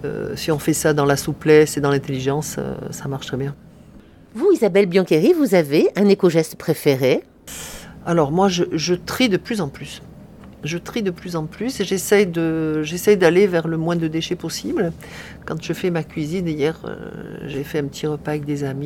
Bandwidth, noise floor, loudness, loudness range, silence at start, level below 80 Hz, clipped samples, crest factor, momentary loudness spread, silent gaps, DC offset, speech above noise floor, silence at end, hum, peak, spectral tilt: 17.5 kHz; -45 dBFS; -19 LUFS; 7 LU; 0 s; -48 dBFS; under 0.1%; 18 dB; 16 LU; none; under 0.1%; 26 dB; 0 s; none; 0 dBFS; -5.5 dB/octave